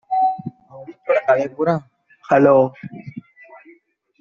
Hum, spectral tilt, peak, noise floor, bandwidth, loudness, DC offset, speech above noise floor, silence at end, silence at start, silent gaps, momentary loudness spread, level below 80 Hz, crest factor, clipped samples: none; -6.5 dB/octave; -2 dBFS; -54 dBFS; 7 kHz; -18 LUFS; under 0.1%; 38 dB; 1 s; 0.1 s; none; 24 LU; -66 dBFS; 18 dB; under 0.1%